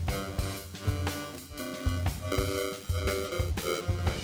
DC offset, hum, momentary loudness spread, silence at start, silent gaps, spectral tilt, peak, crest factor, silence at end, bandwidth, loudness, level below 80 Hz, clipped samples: under 0.1%; none; 6 LU; 0 s; none; -5 dB/octave; -16 dBFS; 16 dB; 0 s; over 20 kHz; -33 LUFS; -38 dBFS; under 0.1%